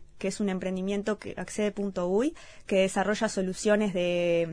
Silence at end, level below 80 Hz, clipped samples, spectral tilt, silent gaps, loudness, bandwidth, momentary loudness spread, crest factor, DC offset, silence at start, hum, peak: 0 s; -54 dBFS; under 0.1%; -5 dB/octave; none; -29 LUFS; 11 kHz; 7 LU; 18 dB; 0.2%; 0 s; none; -10 dBFS